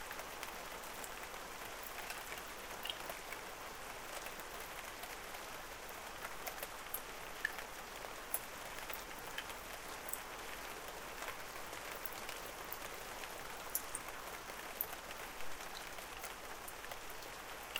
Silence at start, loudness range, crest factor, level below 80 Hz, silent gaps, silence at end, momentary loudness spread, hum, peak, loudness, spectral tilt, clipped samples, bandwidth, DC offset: 0 s; 2 LU; 32 dB; -62 dBFS; none; 0 s; 5 LU; none; -16 dBFS; -46 LUFS; -1 dB/octave; under 0.1%; 18 kHz; under 0.1%